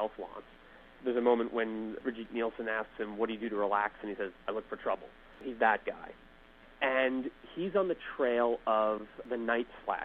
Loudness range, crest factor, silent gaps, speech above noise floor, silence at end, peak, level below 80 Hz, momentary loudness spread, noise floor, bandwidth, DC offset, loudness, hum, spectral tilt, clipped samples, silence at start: 3 LU; 22 dB; none; 24 dB; 0 s; -12 dBFS; -62 dBFS; 12 LU; -57 dBFS; 4.5 kHz; under 0.1%; -33 LUFS; none; -7.5 dB/octave; under 0.1%; 0 s